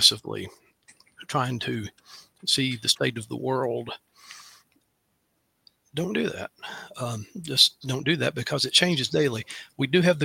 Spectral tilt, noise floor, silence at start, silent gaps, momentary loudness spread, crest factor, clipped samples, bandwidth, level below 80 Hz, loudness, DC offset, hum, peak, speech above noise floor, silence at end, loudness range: -3.5 dB/octave; -73 dBFS; 0 s; none; 20 LU; 24 dB; under 0.1%; 16.5 kHz; -64 dBFS; -25 LUFS; under 0.1%; none; -2 dBFS; 47 dB; 0 s; 11 LU